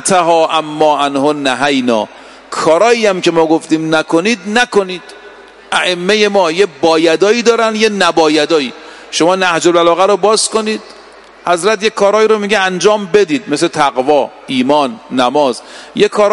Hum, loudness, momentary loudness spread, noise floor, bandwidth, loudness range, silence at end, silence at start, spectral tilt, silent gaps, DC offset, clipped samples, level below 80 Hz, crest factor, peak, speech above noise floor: none; -11 LUFS; 7 LU; -37 dBFS; 11.5 kHz; 2 LU; 0 s; 0 s; -3.5 dB/octave; none; under 0.1%; under 0.1%; -54 dBFS; 12 dB; 0 dBFS; 26 dB